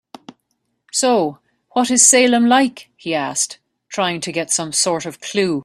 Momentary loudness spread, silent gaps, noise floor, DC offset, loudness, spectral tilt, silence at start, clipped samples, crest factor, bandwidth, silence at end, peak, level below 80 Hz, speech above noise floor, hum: 13 LU; none; -70 dBFS; under 0.1%; -16 LUFS; -2 dB/octave; 0.95 s; under 0.1%; 18 dB; 13.5 kHz; 0 s; 0 dBFS; -64 dBFS; 54 dB; none